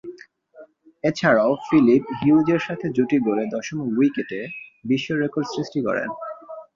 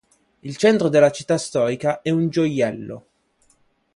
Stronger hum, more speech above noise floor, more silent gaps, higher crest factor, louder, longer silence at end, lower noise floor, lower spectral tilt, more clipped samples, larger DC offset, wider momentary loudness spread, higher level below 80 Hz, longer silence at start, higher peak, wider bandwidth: neither; second, 28 dB vs 43 dB; neither; about the same, 18 dB vs 18 dB; about the same, -21 LUFS vs -19 LUFS; second, 0.1 s vs 0.95 s; second, -48 dBFS vs -62 dBFS; about the same, -6.5 dB/octave vs -6 dB/octave; neither; neither; second, 14 LU vs 19 LU; about the same, -62 dBFS vs -62 dBFS; second, 0.05 s vs 0.45 s; about the same, -4 dBFS vs -4 dBFS; second, 7.4 kHz vs 11.5 kHz